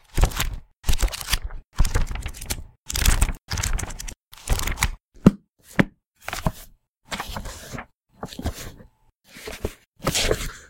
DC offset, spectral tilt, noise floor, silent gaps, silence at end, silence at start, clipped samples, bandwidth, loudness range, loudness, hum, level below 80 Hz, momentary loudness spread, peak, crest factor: under 0.1%; -4 dB/octave; -55 dBFS; 1.66-1.70 s, 2.78-2.84 s, 3.43-3.47 s, 4.23-4.31 s, 6.08-6.12 s, 6.88-6.95 s, 9.15-9.20 s, 9.87-9.92 s; 0.05 s; 0.15 s; under 0.1%; 17 kHz; 9 LU; -26 LUFS; none; -28 dBFS; 17 LU; 0 dBFS; 26 dB